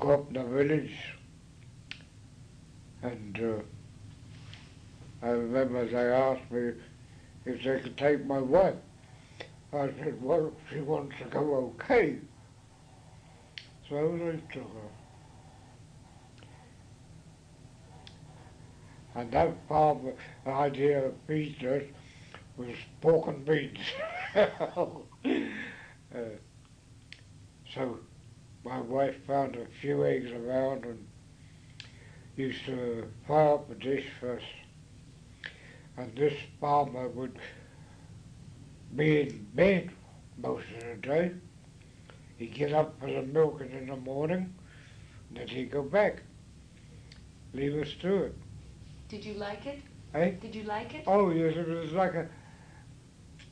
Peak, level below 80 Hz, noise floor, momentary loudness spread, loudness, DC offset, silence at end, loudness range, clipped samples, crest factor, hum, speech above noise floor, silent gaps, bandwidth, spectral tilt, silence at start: -10 dBFS; -58 dBFS; -55 dBFS; 25 LU; -31 LUFS; under 0.1%; 0 s; 8 LU; under 0.1%; 22 dB; none; 25 dB; none; 10.5 kHz; -7 dB/octave; 0 s